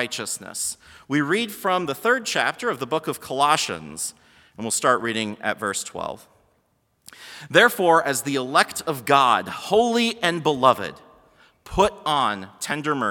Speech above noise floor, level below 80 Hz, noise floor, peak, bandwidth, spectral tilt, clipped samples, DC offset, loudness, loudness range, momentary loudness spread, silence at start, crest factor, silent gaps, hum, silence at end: 45 dB; -54 dBFS; -67 dBFS; 0 dBFS; 18 kHz; -3 dB/octave; under 0.1%; under 0.1%; -22 LUFS; 5 LU; 12 LU; 0 s; 22 dB; none; none; 0 s